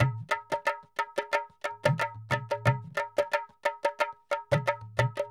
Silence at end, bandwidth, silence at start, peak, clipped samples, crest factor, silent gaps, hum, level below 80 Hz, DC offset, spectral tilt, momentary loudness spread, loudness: 0 s; 15 kHz; 0 s; -10 dBFS; under 0.1%; 20 dB; none; none; -60 dBFS; under 0.1%; -5.5 dB/octave; 5 LU; -31 LUFS